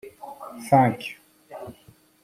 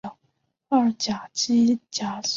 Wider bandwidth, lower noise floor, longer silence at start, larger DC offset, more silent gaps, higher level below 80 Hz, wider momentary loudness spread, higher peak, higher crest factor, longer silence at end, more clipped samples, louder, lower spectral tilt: first, 15.5 kHz vs 7.6 kHz; second, -55 dBFS vs -72 dBFS; about the same, 0.05 s vs 0.05 s; neither; neither; about the same, -64 dBFS vs -66 dBFS; first, 24 LU vs 8 LU; first, -4 dBFS vs -8 dBFS; first, 22 dB vs 16 dB; first, 0.55 s vs 0 s; neither; about the same, -21 LUFS vs -23 LUFS; first, -7 dB/octave vs -3.5 dB/octave